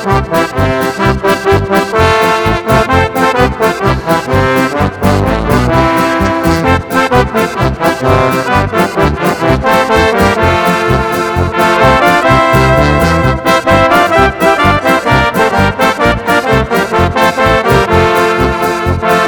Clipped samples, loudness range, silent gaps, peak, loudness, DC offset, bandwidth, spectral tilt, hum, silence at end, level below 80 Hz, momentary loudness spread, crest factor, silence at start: 0.6%; 2 LU; none; 0 dBFS; -10 LUFS; 0.3%; 19.5 kHz; -5.5 dB/octave; none; 0 s; -24 dBFS; 4 LU; 10 dB; 0 s